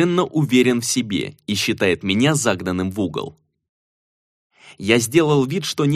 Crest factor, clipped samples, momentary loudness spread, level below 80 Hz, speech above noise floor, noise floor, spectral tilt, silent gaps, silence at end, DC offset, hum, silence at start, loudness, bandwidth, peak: 18 dB; under 0.1%; 9 LU; -56 dBFS; over 71 dB; under -90 dBFS; -4.5 dB/octave; 3.69-4.50 s; 0 s; under 0.1%; none; 0 s; -19 LUFS; 15.5 kHz; -2 dBFS